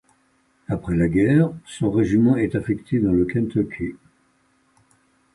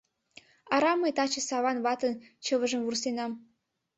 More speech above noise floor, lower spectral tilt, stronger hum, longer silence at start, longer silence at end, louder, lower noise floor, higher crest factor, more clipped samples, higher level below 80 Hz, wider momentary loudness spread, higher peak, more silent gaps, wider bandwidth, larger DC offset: first, 43 dB vs 29 dB; first, -8.5 dB/octave vs -2 dB/octave; neither; about the same, 0.7 s vs 0.65 s; first, 1.4 s vs 0.55 s; first, -21 LUFS vs -29 LUFS; first, -63 dBFS vs -58 dBFS; about the same, 16 dB vs 20 dB; neither; first, -44 dBFS vs -74 dBFS; about the same, 11 LU vs 9 LU; first, -6 dBFS vs -12 dBFS; neither; first, 11.5 kHz vs 8.2 kHz; neither